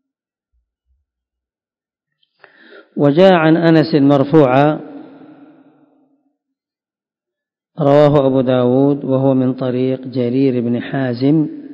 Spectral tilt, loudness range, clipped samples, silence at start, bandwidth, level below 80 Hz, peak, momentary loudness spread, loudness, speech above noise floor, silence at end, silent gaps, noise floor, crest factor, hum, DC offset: -9.5 dB/octave; 6 LU; 0.3%; 2.95 s; 6 kHz; -54 dBFS; 0 dBFS; 9 LU; -13 LUFS; over 78 dB; 0 s; none; under -90 dBFS; 16 dB; none; under 0.1%